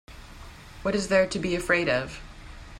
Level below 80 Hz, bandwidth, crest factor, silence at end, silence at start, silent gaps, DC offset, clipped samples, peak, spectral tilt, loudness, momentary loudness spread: -46 dBFS; 14 kHz; 20 dB; 0 s; 0.1 s; none; under 0.1%; under 0.1%; -8 dBFS; -4.5 dB/octave; -25 LUFS; 22 LU